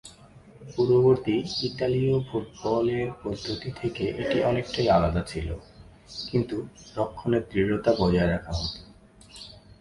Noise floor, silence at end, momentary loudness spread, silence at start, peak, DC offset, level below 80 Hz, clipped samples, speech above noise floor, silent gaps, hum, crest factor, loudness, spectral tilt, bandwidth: -51 dBFS; 0.25 s; 15 LU; 0.05 s; -8 dBFS; under 0.1%; -44 dBFS; under 0.1%; 25 dB; none; none; 18 dB; -26 LUFS; -6.5 dB/octave; 11.5 kHz